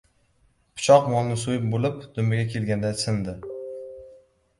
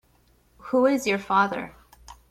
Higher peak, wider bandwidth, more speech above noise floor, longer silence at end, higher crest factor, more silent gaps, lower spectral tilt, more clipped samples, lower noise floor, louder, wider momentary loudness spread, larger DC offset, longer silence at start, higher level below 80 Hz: first, -4 dBFS vs -8 dBFS; second, 11.5 kHz vs 15.5 kHz; about the same, 41 dB vs 39 dB; first, 0.45 s vs 0.15 s; about the same, 22 dB vs 18 dB; neither; about the same, -6 dB/octave vs -5 dB/octave; neither; about the same, -64 dBFS vs -62 dBFS; about the same, -24 LUFS vs -23 LUFS; first, 20 LU vs 17 LU; neither; about the same, 0.75 s vs 0.65 s; about the same, -54 dBFS vs -58 dBFS